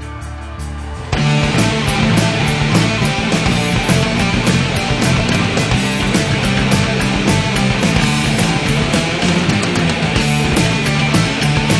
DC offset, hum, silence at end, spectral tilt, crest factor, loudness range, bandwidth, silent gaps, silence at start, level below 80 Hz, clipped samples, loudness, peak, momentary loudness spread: under 0.1%; none; 0 s; -5 dB/octave; 14 dB; 0 LU; 11 kHz; none; 0 s; -28 dBFS; under 0.1%; -14 LUFS; 0 dBFS; 2 LU